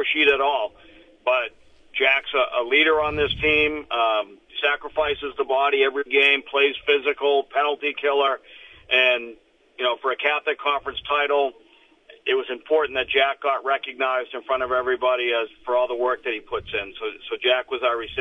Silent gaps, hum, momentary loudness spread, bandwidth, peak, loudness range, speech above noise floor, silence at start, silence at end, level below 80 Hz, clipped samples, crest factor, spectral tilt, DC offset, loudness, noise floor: none; none; 10 LU; 6 kHz; -4 dBFS; 4 LU; 30 dB; 0 s; 0 s; -52 dBFS; under 0.1%; 18 dB; -5 dB/octave; under 0.1%; -22 LUFS; -53 dBFS